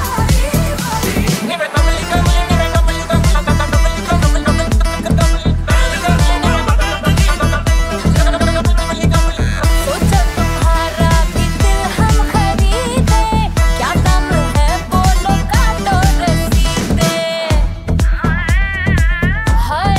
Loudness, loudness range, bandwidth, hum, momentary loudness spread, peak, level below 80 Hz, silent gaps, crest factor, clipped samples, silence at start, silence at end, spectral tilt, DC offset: -14 LUFS; 1 LU; 16 kHz; none; 3 LU; 0 dBFS; -16 dBFS; none; 12 dB; under 0.1%; 0 s; 0 s; -5 dB/octave; under 0.1%